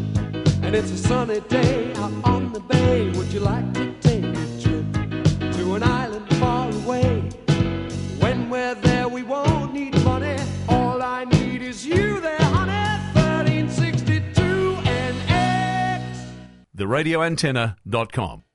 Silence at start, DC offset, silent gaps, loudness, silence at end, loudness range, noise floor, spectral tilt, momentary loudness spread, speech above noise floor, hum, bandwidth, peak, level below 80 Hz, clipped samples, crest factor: 0 s; under 0.1%; none; -22 LUFS; 0.15 s; 2 LU; -41 dBFS; -6.5 dB/octave; 6 LU; 20 dB; none; 11.5 kHz; -4 dBFS; -38 dBFS; under 0.1%; 18 dB